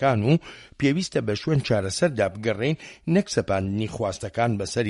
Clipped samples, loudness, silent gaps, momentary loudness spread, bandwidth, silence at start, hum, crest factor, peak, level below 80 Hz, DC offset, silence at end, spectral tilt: under 0.1%; -24 LUFS; none; 6 LU; 11.5 kHz; 0 s; none; 18 dB; -6 dBFS; -52 dBFS; under 0.1%; 0 s; -6 dB/octave